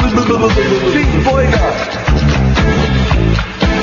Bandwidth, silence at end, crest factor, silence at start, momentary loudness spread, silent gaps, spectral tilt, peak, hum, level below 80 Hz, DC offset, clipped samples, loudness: 7.2 kHz; 0 s; 10 dB; 0 s; 3 LU; none; -6.5 dB/octave; 0 dBFS; none; -18 dBFS; under 0.1%; under 0.1%; -12 LUFS